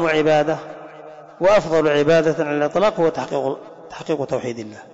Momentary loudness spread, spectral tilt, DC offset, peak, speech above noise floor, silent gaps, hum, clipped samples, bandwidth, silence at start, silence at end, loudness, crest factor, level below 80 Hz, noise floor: 20 LU; -6 dB/octave; under 0.1%; -8 dBFS; 21 dB; none; none; under 0.1%; 7.8 kHz; 0 s; 0 s; -19 LUFS; 12 dB; -52 dBFS; -40 dBFS